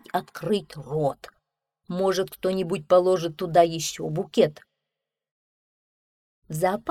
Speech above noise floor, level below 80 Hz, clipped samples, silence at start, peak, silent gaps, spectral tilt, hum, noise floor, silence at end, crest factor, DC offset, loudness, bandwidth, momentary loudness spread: 62 dB; -62 dBFS; under 0.1%; 0.15 s; -6 dBFS; 5.31-6.42 s; -5 dB/octave; none; -86 dBFS; 0 s; 20 dB; under 0.1%; -25 LUFS; 16 kHz; 10 LU